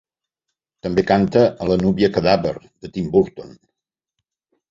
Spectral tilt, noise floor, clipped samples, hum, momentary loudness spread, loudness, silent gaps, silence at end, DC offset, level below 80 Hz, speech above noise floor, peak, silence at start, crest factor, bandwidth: -7.5 dB/octave; -81 dBFS; under 0.1%; none; 15 LU; -18 LUFS; none; 1.2 s; under 0.1%; -46 dBFS; 63 dB; -2 dBFS; 0.85 s; 18 dB; 7.6 kHz